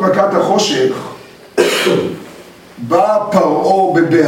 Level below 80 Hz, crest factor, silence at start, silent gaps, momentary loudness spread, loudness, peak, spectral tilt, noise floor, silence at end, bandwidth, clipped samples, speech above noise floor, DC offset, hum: -56 dBFS; 14 dB; 0 s; none; 13 LU; -13 LUFS; 0 dBFS; -4.5 dB/octave; -37 dBFS; 0 s; 17 kHz; under 0.1%; 24 dB; under 0.1%; none